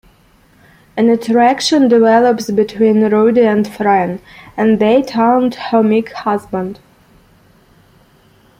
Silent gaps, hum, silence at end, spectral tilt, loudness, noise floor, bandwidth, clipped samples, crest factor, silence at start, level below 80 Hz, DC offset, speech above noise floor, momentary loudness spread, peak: none; none; 1.85 s; -5.5 dB/octave; -13 LUFS; -50 dBFS; 15.5 kHz; under 0.1%; 12 dB; 0.95 s; -52 dBFS; under 0.1%; 37 dB; 11 LU; -2 dBFS